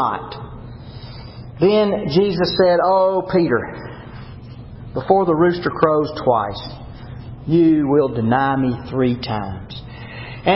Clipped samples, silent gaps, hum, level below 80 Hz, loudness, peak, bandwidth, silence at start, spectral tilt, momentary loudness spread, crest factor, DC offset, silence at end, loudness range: under 0.1%; none; none; -42 dBFS; -17 LUFS; 0 dBFS; 5.8 kHz; 0 s; -11 dB/octave; 21 LU; 18 dB; under 0.1%; 0 s; 2 LU